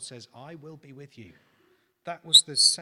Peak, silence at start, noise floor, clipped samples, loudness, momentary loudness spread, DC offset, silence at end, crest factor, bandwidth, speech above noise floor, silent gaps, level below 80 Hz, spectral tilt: -4 dBFS; 0 s; -66 dBFS; under 0.1%; -18 LUFS; 27 LU; under 0.1%; 0 s; 24 dB; 16 kHz; 40 dB; none; -70 dBFS; 0 dB/octave